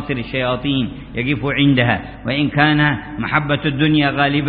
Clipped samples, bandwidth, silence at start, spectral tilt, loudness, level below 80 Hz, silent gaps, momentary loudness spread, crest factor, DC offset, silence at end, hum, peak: under 0.1%; 4.9 kHz; 0 s; -11.5 dB/octave; -17 LUFS; -40 dBFS; none; 8 LU; 16 dB; under 0.1%; 0 s; none; -2 dBFS